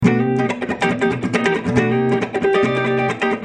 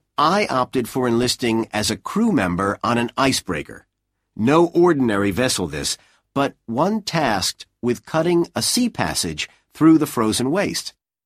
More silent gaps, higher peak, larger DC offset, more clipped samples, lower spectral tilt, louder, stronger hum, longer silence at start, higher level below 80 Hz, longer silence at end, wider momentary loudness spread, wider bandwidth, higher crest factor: neither; about the same, -2 dBFS vs -2 dBFS; neither; neither; first, -6.5 dB/octave vs -4.5 dB/octave; about the same, -18 LUFS vs -20 LUFS; neither; second, 0 s vs 0.2 s; about the same, -50 dBFS vs -50 dBFS; second, 0 s vs 0.35 s; second, 3 LU vs 9 LU; second, 10 kHz vs 15.5 kHz; about the same, 16 dB vs 18 dB